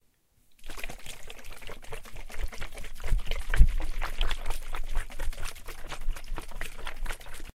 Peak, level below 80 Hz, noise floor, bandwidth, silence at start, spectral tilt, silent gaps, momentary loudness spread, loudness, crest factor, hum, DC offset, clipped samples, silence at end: -4 dBFS; -30 dBFS; -65 dBFS; 14.5 kHz; 0.5 s; -4 dB/octave; none; 14 LU; -37 LUFS; 24 dB; none; under 0.1%; under 0.1%; 0.05 s